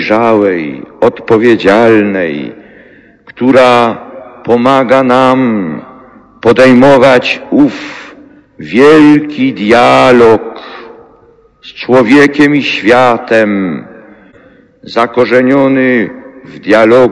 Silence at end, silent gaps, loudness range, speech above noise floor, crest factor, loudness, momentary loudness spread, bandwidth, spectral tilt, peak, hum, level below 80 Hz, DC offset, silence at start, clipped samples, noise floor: 0 s; none; 3 LU; 36 dB; 8 dB; -7 LUFS; 17 LU; 11 kHz; -6 dB/octave; 0 dBFS; none; -44 dBFS; under 0.1%; 0 s; 7%; -43 dBFS